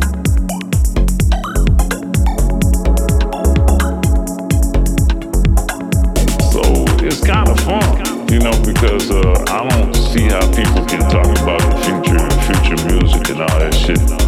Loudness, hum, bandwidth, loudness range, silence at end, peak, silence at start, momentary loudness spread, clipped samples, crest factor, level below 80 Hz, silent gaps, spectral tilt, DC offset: -14 LUFS; none; 15.5 kHz; 2 LU; 0 s; 0 dBFS; 0 s; 3 LU; under 0.1%; 12 dB; -14 dBFS; none; -5.5 dB/octave; under 0.1%